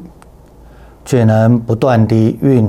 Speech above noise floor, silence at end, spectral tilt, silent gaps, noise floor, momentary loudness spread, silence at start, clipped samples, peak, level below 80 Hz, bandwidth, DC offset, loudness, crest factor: 30 dB; 0 s; -8.5 dB/octave; none; -40 dBFS; 3 LU; 0 s; under 0.1%; -2 dBFS; -42 dBFS; 12.5 kHz; under 0.1%; -12 LUFS; 12 dB